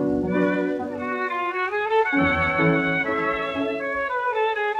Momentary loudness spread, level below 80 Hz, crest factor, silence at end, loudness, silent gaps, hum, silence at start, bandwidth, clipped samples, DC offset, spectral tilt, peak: 6 LU; -50 dBFS; 16 dB; 0 s; -23 LUFS; none; none; 0 s; 8.8 kHz; under 0.1%; under 0.1%; -7.5 dB/octave; -8 dBFS